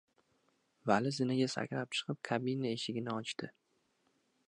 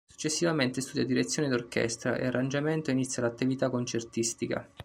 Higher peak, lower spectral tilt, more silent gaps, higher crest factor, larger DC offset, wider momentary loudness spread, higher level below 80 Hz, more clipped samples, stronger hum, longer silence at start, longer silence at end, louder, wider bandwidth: about the same, -14 dBFS vs -12 dBFS; about the same, -5 dB/octave vs -4.5 dB/octave; neither; first, 24 dB vs 18 dB; neither; first, 10 LU vs 4 LU; second, -78 dBFS vs -64 dBFS; neither; neither; first, 0.85 s vs 0.2 s; first, 1 s vs 0 s; second, -36 LUFS vs -30 LUFS; second, 11 kHz vs 15.5 kHz